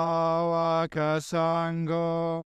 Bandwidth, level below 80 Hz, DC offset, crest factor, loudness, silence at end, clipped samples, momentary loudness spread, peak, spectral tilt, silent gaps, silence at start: 12.5 kHz; -64 dBFS; under 0.1%; 12 dB; -27 LUFS; 0.15 s; under 0.1%; 3 LU; -14 dBFS; -6.5 dB/octave; none; 0 s